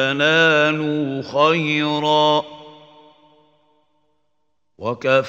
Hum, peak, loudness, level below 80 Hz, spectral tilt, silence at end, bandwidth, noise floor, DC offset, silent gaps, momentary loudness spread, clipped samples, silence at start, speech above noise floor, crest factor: none; -2 dBFS; -17 LUFS; -66 dBFS; -5 dB/octave; 0 s; 7.8 kHz; -75 dBFS; under 0.1%; none; 11 LU; under 0.1%; 0 s; 57 dB; 18 dB